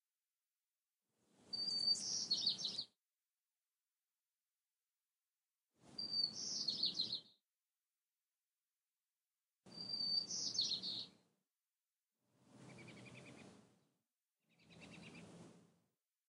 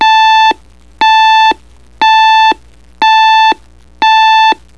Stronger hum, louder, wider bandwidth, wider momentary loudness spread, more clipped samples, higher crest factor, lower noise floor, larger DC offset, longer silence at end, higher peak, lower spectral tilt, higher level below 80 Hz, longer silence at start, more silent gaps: second, none vs 60 Hz at -45 dBFS; second, -40 LUFS vs -7 LUFS; first, 13.5 kHz vs 10.5 kHz; first, 22 LU vs 8 LU; neither; first, 22 dB vs 8 dB; first, under -90 dBFS vs -28 dBFS; second, under 0.1% vs 0.9%; first, 0.7 s vs 0.25 s; second, -26 dBFS vs 0 dBFS; about the same, -0.5 dB/octave vs -0.5 dB/octave; second, under -90 dBFS vs -44 dBFS; first, 1.45 s vs 0 s; neither